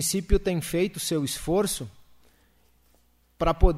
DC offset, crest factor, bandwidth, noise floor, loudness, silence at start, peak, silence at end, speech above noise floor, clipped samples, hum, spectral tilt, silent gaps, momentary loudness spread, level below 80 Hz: under 0.1%; 22 dB; 16 kHz; -64 dBFS; -27 LUFS; 0 s; -4 dBFS; 0 s; 40 dB; under 0.1%; none; -4.5 dB/octave; none; 4 LU; -32 dBFS